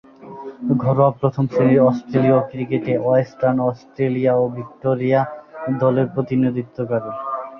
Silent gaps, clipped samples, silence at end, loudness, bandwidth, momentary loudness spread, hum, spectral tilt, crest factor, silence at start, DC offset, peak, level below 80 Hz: none; under 0.1%; 0 s; -19 LUFS; 6.2 kHz; 11 LU; none; -10 dB/octave; 16 dB; 0.2 s; under 0.1%; -2 dBFS; -58 dBFS